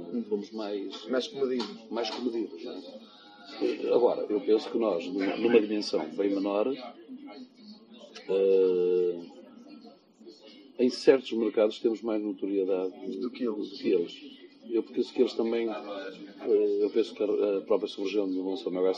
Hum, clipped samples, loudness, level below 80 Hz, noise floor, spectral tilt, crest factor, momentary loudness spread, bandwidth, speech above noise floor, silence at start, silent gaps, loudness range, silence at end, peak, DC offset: none; under 0.1%; -29 LUFS; -84 dBFS; -53 dBFS; -5.5 dB/octave; 22 dB; 20 LU; 9 kHz; 24 dB; 0 s; none; 4 LU; 0 s; -8 dBFS; under 0.1%